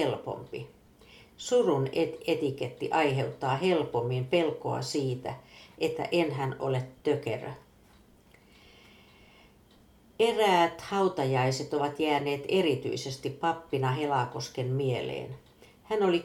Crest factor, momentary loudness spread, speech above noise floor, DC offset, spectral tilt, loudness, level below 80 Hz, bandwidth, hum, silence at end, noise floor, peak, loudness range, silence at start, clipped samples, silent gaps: 18 dB; 11 LU; 30 dB; under 0.1%; -5.5 dB/octave; -29 LUFS; -64 dBFS; 15.5 kHz; none; 0 s; -59 dBFS; -12 dBFS; 6 LU; 0 s; under 0.1%; none